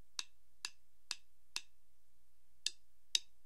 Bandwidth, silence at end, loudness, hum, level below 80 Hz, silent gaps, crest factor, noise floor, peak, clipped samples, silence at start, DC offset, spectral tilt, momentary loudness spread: 15.5 kHz; 0.25 s; -44 LUFS; none; -82 dBFS; none; 36 dB; -79 dBFS; -12 dBFS; under 0.1%; 0.2 s; 0.3%; 2.5 dB/octave; 10 LU